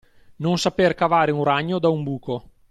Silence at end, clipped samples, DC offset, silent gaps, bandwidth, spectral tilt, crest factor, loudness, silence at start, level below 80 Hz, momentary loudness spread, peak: 0.3 s; under 0.1%; under 0.1%; none; 12.5 kHz; -6 dB/octave; 16 dB; -21 LUFS; 0.4 s; -54 dBFS; 10 LU; -6 dBFS